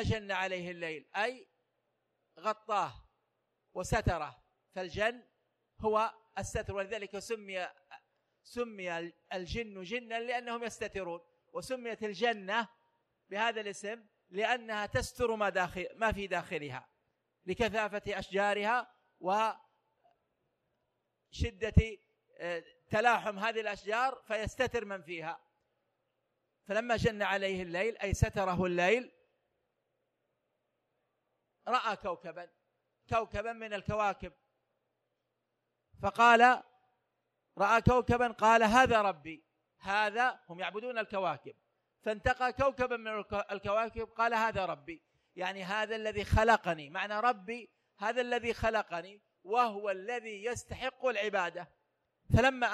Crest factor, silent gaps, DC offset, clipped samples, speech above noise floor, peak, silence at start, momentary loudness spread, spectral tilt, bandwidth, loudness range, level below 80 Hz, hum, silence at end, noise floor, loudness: 24 dB; none; under 0.1%; under 0.1%; 51 dB; -10 dBFS; 0 s; 15 LU; -5 dB/octave; 13 kHz; 10 LU; -50 dBFS; none; 0 s; -84 dBFS; -33 LUFS